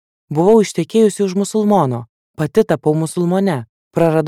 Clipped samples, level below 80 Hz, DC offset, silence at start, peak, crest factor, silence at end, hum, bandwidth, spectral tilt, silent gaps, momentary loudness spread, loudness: under 0.1%; -54 dBFS; under 0.1%; 0.3 s; -2 dBFS; 14 dB; 0 s; none; 14.5 kHz; -6.5 dB/octave; 2.09-2.34 s, 3.69-3.91 s; 11 LU; -16 LUFS